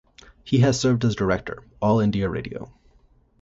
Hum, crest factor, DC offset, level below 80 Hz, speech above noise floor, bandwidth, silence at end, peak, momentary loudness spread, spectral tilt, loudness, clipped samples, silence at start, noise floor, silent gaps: none; 16 dB; under 0.1%; -46 dBFS; 36 dB; 8 kHz; 0.75 s; -6 dBFS; 17 LU; -6.5 dB/octave; -22 LUFS; under 0.1%; 0.45 s; -58 dBFS; none